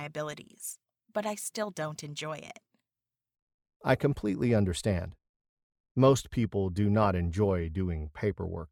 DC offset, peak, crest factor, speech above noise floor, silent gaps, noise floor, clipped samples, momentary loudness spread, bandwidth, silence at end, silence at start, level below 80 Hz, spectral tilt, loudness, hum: under 0.1%; -10 dBFS; 22 dB; over 60 dB; 3.42-3.47 s, 3.54-3.58 s, 3.76-3.80 s, 5.29-5.40 s, 5.49-5.57 s, 5.63-5.70 s, 5.80-5.84 s, 5.91-5.95 s; under -90 dBFS; under 0.1%; 14 LU; 19.5 kHz; 0.05 s; 0 s; -50 dBFS; -6 dB/octave; -30 LUFS; none